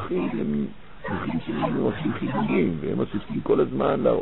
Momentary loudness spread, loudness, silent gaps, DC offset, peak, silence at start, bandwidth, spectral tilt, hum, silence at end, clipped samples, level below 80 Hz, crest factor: 7 LU; -25 LUFS; none; 1%; -8 dBFS; 0 s; 4.2 kHz; -11.5 dB/octave; none; 0 s; under 0.1%; -48 dBFS; 16 dB